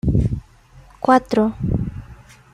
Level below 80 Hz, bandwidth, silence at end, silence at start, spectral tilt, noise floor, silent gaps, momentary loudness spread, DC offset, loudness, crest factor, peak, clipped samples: -32 dBFS; 12 kHz; 0.4 s; 0.05 s; -8 dB/octave; -47 dBFS; none; 15 LU; under 0.1%; -20 LUFS; 18 dB; -2 dBFS; under 0.1%